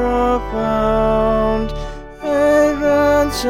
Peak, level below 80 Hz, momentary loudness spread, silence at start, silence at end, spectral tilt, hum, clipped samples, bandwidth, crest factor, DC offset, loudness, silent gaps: -2 dBFS; -28 dBFS; 12 LU; 0 s; 0 s; -5.5 dB/octave; none; under 0.1%; 16.5 kHz; 14 dB; 0.2%; -16 LUFS; none